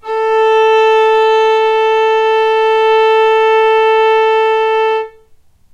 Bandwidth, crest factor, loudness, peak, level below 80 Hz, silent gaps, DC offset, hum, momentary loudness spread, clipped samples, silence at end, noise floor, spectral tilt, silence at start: 7.4 kHz; 10 dB; -10 LUFS; -2 dBFS; -54 dBFS; none; under 0.1%; none; 3 LU; under 0.1%; 0.65 s; -45 dBFS; -1 dB/octave; 0.05 s